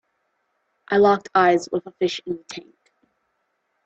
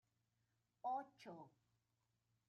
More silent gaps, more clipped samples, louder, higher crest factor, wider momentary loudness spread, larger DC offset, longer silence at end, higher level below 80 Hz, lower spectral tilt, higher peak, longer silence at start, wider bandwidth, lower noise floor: neither; neither; first, -20 LUFS vs -50 LUFS; about the same, 20 dB vs 18 dB; about the same, 15 LU vs 15 LU; neither; first, 1.25 s vs 1 s; first, -64 dBFS vs under -90 dBFS; about the same, -5 dB/octave vs -4 dB/octave; first, -4 dBFS vs -36 dBFS; about the same, 0.9 s vs 0.85 s; first, 8.2 kHz vs 7 kHz; second, -73 dBFS vs -88 dBFS